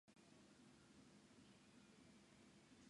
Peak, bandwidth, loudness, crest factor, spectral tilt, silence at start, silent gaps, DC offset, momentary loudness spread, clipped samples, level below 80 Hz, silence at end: -56 dBFS; 11 kHz; -69 LUFS; 14 dB; -4 dB/octave; 0.05 s; none; under 0.1%; 1 LU; under 0.1%; -88 dBFS; 0 s